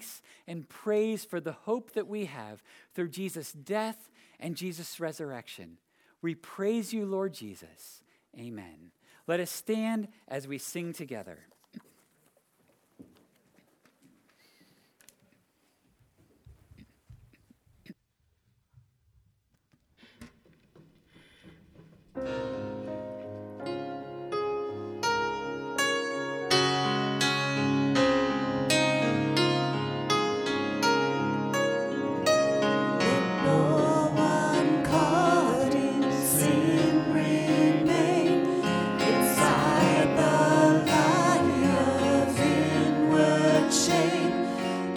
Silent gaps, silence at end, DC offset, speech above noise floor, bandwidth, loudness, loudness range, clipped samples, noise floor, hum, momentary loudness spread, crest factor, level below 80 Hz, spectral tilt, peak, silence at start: none; 0 s; under 0.1%; 38 dB; over 20 kHz; -26 LUFS; 15 LU; under 0.1%; -73 dBFS; none; 17 LU; 20 dB; -62 dBFS; -4.5 dB/octave; -8 dBFS; 0 s